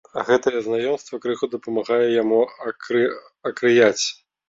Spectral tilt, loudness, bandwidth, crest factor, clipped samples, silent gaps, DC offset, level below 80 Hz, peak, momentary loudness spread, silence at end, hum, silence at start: -3.5 dB/octave; -21 LUFS; 7.8 kHz; 18 dB; under 0.1%; none; under 0.1%; -66 dBFS; -4 dBFS; 10 LU; 0.35 s; none; 0.15 s